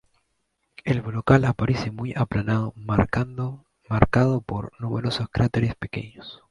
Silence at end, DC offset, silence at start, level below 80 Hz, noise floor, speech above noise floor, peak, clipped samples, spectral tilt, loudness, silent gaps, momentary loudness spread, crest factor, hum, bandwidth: 0.15 s; under 0.1%; 0.85 s; -42 dBFS; -74 dBFS; 51 dB; 0 dBFS; under 0.1%; -7.5 dB/octave; -24 LUFS; none; 13 LU; 24 dB; none; 11 kHz